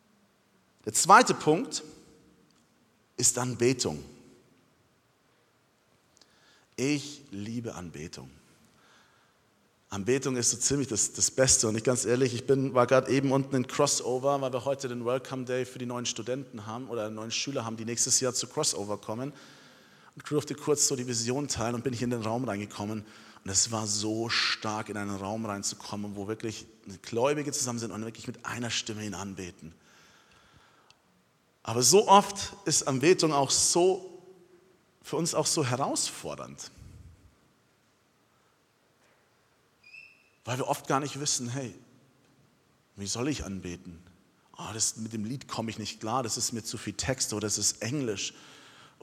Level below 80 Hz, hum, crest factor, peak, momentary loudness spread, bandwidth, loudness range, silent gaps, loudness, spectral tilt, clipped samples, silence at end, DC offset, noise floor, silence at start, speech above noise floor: -62 dBFS; none; 26 dB; -4 dBFS; 17 LU; 16 kHz; 12 LU; none; -28 LUFS; -3 dB/octave; under 0.1%; 0.2 s; under 0.1%; -68 dBFS; 0.85 s; 39 dB